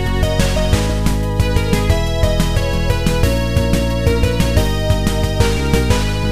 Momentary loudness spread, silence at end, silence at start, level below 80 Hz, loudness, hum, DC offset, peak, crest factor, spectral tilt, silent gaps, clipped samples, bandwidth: 2 LU; 0 s; 0 s; -20 dBFS; -16 LUFS; none; 2%; 0 dBFS; 14 dB; -5.5 dB/octave; none; under 0.1%; 15.5 kHz